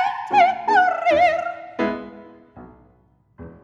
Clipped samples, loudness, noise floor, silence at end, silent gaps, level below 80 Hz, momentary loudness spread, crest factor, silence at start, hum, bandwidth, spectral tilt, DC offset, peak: under 0.1%; -19 LUFS; -58 dBFS; 0.15 s; none; -56 dBFS; 13 LU; 16 dB; 0 s; none; 7.8 kHz; -4.5 dB/octave; under 0.1%; -4 dBFS